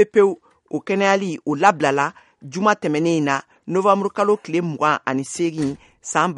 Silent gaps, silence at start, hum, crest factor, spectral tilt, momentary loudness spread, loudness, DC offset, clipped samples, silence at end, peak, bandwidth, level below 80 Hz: none; 0 s; none; 20 dB; -5 dB/octave; 9 LU; -20 LUFS; under 0.1%; under 0.1%; 0 s; 0 dBFS; 11.5 kHz; -64 dBFS